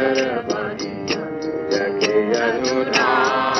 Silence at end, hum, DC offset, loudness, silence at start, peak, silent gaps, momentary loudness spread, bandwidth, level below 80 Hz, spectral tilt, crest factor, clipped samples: 0 s; none; under 0.1%; -20 LUFS; 0 s; -4 dBFS; none; 9 LU; 7.2 kHz; -56 dBFS; -3.5 dB/octave; 16 dB; under 0.1%